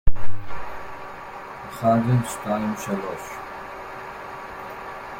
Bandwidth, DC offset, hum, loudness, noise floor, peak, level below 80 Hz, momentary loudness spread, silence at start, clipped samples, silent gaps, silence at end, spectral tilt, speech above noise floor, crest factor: 16.5 kHz; under 0.1%; none; -28 LUFS; -37 dBFS; -4 dBFS; -36 dBFS; 16 LU; 0.05 s; under 0.1%; none; 0 s; -6.5 dB/octave; 14 dB; 18 dB